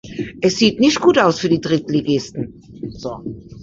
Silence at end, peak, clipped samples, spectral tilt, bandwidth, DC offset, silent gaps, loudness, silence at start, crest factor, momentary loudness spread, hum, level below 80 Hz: 0 s; 0 dBFS; under 0.1%; -5 dB/octave; 7.8 kHz; under 0.1%; none; -16 LUFS; 0.05 s; 16 dB; 18 LU; none; -48 dBFS